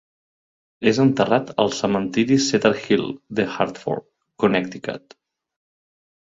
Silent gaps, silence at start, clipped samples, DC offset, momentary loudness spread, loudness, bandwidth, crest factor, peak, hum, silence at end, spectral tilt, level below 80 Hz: none; 0.8 s; under 0.1%; under 0.1%; 12 LU; -21 LUFS; 7.8 kHz; 22 dB; 0 dBFS; none; 1.35 s; -5 dB/octave; -58 dBFS